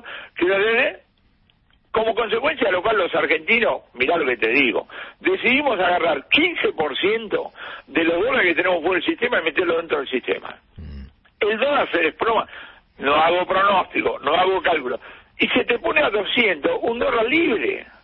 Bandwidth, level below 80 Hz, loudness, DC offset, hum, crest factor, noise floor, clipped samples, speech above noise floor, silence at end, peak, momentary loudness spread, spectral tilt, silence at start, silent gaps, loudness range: 5.6 kHz; -50 dBFS; -19 LUFS; under 0.1%; none; 18 dB; -60 dBFS; under 0.1%; 40 dB; 0.2 s; -2 dBFS; 9 LU; -9 dB/octave; 0.05 s; none; 3 LU